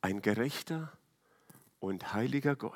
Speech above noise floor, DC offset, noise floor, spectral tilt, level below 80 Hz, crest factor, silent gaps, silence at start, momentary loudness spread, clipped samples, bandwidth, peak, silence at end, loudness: 34 dB; under 0.1%; -68 dBFS; -6 dB/octave; -78 dBFS; 22 dB; none; 0.05 s; 9 LU; under 0.1%; 17.5 kHz; -14 dBFS; 0 s; -35 LUFS